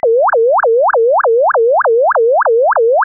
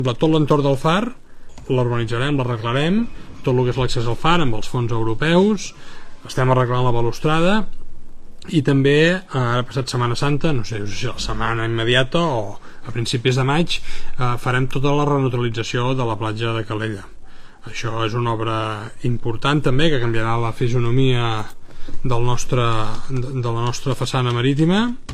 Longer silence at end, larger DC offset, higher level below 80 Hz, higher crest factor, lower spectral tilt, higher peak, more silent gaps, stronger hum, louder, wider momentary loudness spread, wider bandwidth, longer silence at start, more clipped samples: about the same, 0 s vs 0 s; neither; second, -64 dBFS vs -32 dBFS; second, 4 dB vs 18 dB; second, 8 dB/octave vs -6 dB/octave; second, -6 dBFS vs 0 dBFS; neither; neither; first, -11 LUFS vs -20 LUFS; second, 0 LU vs 10 LU; second, 1.9 kHz vs 11 kHz; about the same, 0.05 s vs 0 s; neither